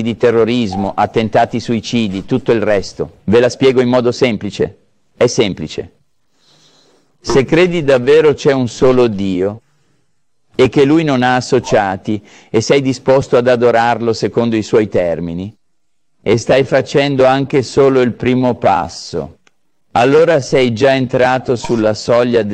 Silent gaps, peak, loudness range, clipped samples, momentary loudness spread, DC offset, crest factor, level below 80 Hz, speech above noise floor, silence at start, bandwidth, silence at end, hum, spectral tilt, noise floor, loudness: none; 0 dBFS; 2 LU; under 0.1%; 10 LU; 0.2%; 12 dB; -44 dBFS; 59 dB; 0 s; 9.4 kHz; 0 s; none; -6 dB/octave; -71 dBFS; -13 LUFS